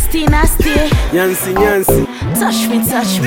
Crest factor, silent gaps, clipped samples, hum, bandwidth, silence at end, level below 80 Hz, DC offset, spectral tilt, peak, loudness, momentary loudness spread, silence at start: 12 dB; none; under 0.1%; none; 17 kHz; 0 s; -18 dBFS; under 0.1%; -4.5 dB/octave; 0 dBFS; -13 LUFS; 2 LU; 0 s